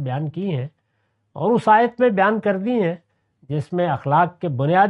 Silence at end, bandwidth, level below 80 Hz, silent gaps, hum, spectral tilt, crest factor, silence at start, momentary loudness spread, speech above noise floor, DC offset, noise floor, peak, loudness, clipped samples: 0 s; 11 kHz; -64 dBFS; none; none; -8.5 dB/octave; 16 dB; 0 s; 13 LU; 50 dB; under 0.1%; -69 dBFS; -4 dBFS; -20 LUFS; under 0.1%